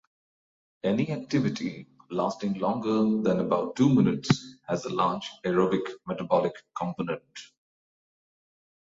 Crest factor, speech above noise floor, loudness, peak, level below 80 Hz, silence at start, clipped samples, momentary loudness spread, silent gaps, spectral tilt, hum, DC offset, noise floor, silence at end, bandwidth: 22 dB; over 63 dB; -27 LUFS; -6 dBFS; -64 dBFS; 0.85 s; under 0.1%; 11 LU; none; -6.5 dB/octave; none; under 0.1%; under -90 dBFS; 1.4 s; 7.8 kHz